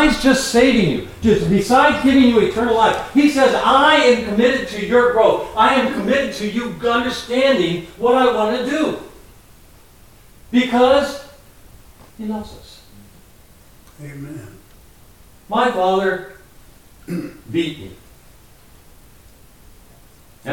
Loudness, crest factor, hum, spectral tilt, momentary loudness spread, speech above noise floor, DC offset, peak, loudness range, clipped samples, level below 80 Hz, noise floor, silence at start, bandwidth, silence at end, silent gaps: -16 LUFS; 16 dB; none; -5 dB/octave; 16 LU; 31 dB; 0.2%; -2 dBFS; 17 LU; under 0.1%; -42 dBFS; -47 dBFS; 0 s; 17 kHz; 0 s; none